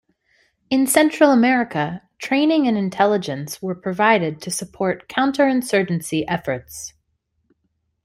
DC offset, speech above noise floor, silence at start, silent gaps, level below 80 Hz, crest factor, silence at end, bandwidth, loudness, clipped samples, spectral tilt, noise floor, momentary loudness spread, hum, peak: under 0.1%; 52 dB; 0.7 s; none; -60 dBFS; 18 dB; 1.15 s; 16 kHz; -19 LUFS; under 0.1%; -4.5 dB/octave; -71 dBFS; 13 LU; none; -2 dBFS